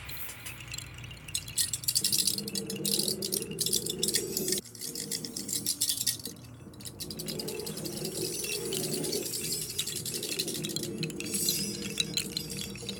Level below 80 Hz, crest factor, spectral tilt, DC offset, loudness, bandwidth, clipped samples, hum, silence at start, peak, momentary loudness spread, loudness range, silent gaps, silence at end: -60 dBFS; 24 dB; -2 dB/octave; under 0.1%; -31 LUFS; 19 kHz; under 0.1%; none; 0 s; -10 dBFS; 12 LU; 4 LU; none; 0 s